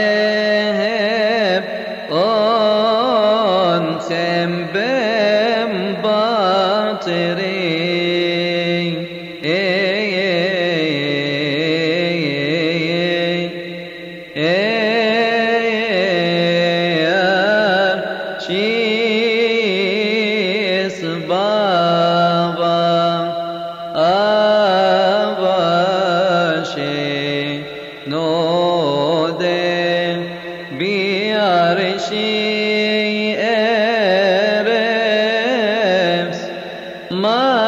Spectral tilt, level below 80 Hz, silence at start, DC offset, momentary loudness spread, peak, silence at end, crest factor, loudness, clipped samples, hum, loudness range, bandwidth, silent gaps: -5.5 dB/octave; -58 dBFS; 0 s; under 0.1%; 8 LU; -4 dBFS; 0 s; 12 dB; -16 LUFS; under 0.1%; none; 3 LU; 10 kHz; none